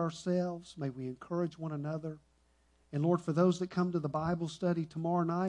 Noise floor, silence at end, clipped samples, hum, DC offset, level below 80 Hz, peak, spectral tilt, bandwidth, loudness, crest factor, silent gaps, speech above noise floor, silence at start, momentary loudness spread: -70 dBFS; 0 s; under 0.1%; none; under 0.1%; -68 dBFS; -16 dBFS; -7.5 dB/octave; 10 kHz; -34 LUFS; 18 dB; none; 36 dB; 0 s; 11 LU